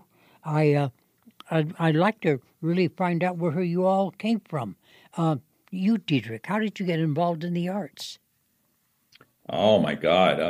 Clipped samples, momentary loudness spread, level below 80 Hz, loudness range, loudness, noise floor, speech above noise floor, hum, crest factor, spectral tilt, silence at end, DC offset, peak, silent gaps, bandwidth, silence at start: under 0.1%; 11 LU; -66 dBFS; 4 LU; -25 LUFS; -70 dBFS; 45 dB; none; 18 dB; -7 dB/octave; 0 s; under 0.1%; -6 dBFS; none; 15 kHz; 0.45 s